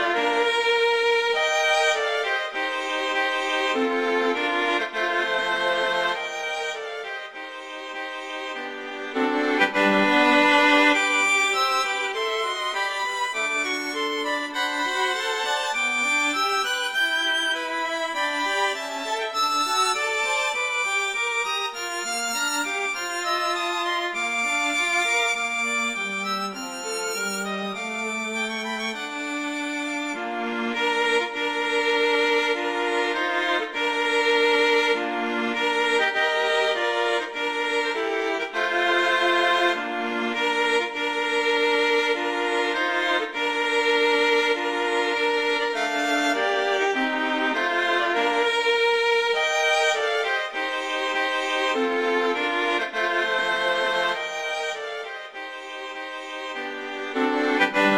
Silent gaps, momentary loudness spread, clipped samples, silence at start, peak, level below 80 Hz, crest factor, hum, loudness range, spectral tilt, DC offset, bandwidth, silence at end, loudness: none; 9 LU; under 0.1%; 0 s; -6 dBFS; -70 dBFS; 18 dB; none; 6 LU; -1.5 dB/octave; under 0.1%; 16.5 kHz; 0 s; -23 LUFS